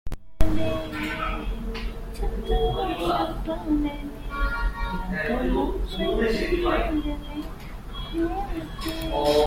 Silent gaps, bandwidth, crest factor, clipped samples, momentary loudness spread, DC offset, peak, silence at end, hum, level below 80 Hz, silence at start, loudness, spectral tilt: none; 16.5 kHz; 20 dB; under 0.1%; 10 LU; under 0.1%; -4 dBFS; 0 s; none; -30 dBFS; 0.05 s; -28 LUFS; -6 dB/octave